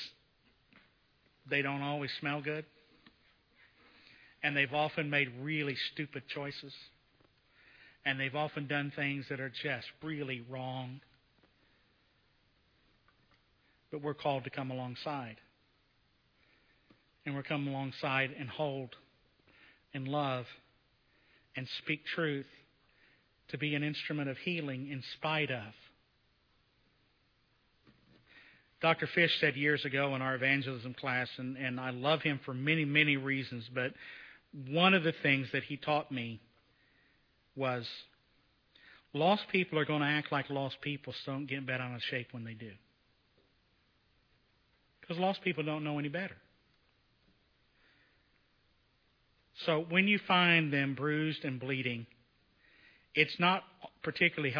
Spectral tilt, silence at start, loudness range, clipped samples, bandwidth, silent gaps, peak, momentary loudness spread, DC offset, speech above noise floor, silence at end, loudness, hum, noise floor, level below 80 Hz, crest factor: -7 dB/octave; 0 s; 11 LU; under 0.1%; 5.4 kHz; none; -12 dBFS; 16 LU; under 0.1%; 38 dB; 0 s; -34 LUFS; none; -73 dBFS; -78 dBFS; 24 dB